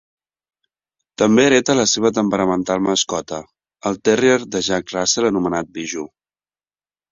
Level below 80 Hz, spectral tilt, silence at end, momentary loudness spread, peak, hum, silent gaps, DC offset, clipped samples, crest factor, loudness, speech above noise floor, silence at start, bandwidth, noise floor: -54 dBFS; -3.5 dB/octave; 1.05 s; 13 LU; -2 dBFS; none; none; under 0.1%; under 0.1%; 18 dB; -17 LUFS; over 73 dB; 1.2 s; 7.8 kHz; under -90 dBFS